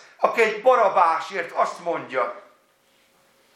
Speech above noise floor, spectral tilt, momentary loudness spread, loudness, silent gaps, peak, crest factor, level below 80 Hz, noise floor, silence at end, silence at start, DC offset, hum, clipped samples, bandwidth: 40 dB; -3.5 dB/octave; 10 LU; -21 LUFS; none; -2 dBFS; 20 dB; -82 dBFS; -61 dBFS; 1.15 s; 0.2 s; under 0.1%; none; under 0.1%; 13 kHz